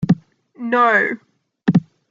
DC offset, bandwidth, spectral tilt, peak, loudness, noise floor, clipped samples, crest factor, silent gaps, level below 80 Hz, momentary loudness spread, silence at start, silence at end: under 0.1%; 7.2 kHz; -8 dB/octave; -2 dBFS; -18 LUFS; -37 dBFS; under 0.1%; 16 dB; none; -54 dBFS; 13 LU; 0 s; 0.3 s